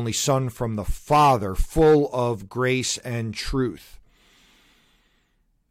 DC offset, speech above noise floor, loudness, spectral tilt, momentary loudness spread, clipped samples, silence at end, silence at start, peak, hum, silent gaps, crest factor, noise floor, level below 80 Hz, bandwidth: under 0.1%; 45 dB; -22 LUFS; -5 dB/octave; 11 LU; under 0.1%; 1.95 s; 0 s; -10 dBFS; none; none; 14 dB; -67 dBFS; -36 dBFS; 16 kHz